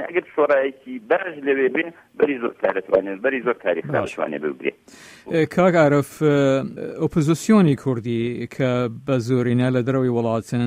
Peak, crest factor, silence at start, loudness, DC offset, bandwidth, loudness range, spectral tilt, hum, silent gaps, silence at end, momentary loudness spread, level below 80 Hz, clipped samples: -4 dBFS; 18 dB; 0 s; -21 LUFS; under 0.1%; 15.5 kHz; 4 LU; -7 dB/octave; none; none; 0 s; 9 LU; -58 dBFS; under 0.1%